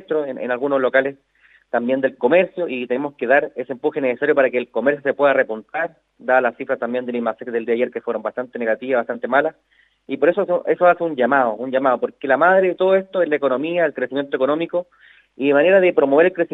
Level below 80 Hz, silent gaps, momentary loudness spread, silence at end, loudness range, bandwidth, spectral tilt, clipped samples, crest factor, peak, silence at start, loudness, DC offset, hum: -74 dBFS; none; 10 LU; 0.05 s; 5 LU; 4 kHz; -8 dB/octave; under 0.1%; 18 dB; -2 dBFS; 0.1 s; -19 LUFS; under 0.1%; none